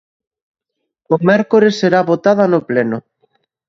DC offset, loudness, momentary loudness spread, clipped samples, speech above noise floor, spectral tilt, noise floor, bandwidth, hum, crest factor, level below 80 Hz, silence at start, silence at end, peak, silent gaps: under 0.1%; -13 LUFS; 7 LU; under 0.1%; 49 dB; -7 dB/octave; -62 dBFS; 7.6 kHz; none; 16 dB; -60 dBFS; 1.1 s; 0.7 s; 0 dBFS; none